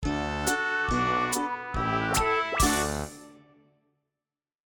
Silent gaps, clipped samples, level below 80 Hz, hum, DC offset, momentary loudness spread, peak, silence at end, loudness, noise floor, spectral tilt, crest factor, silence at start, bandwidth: none; under 0.1%; -40 dBFS; none; under 0.1%; 7 LU; -10 dBFS; 1.4 s; -27 LUFS; under -90 dBFS; -3.5 dB/octave; 20 dB; 0 s; 17.5 kHz